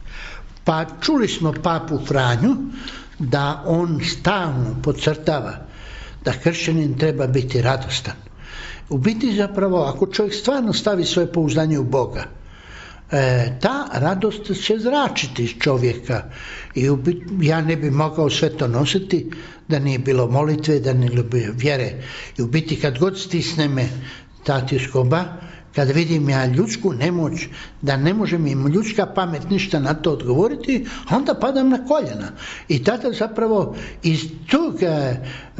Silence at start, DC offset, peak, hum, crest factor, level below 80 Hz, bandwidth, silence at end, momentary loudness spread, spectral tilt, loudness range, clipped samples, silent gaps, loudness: 0 s; under 0.1%; -4 dBFS; none; 16 dB; -42 dBFS; 8 kHz; 0 s; 12 LU; -5.5 dB/octave; 2 LU; under 0.1%; none; -20 LUFS